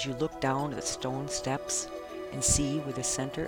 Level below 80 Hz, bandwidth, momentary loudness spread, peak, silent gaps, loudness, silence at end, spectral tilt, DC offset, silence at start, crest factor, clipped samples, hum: -46 dBFS; 19 kHz; 8 LU; -12 dBFS; none; -31 LUFS; 0 s; -3.5 dB/octave; under 0.1%; 0 s; 20 dB; under 0.1%; none